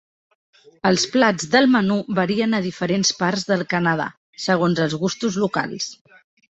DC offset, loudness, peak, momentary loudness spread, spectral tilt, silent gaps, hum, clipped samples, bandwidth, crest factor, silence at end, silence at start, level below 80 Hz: under 0.1%; -20 LUFS; -2 dBFS; 8 LU; -4.5 dB/octave; 4.17-4.33 s; none; under 0.1%; 8.2 kHz; 20 dB; 0.65 s; 0.85 s; -60 dBFS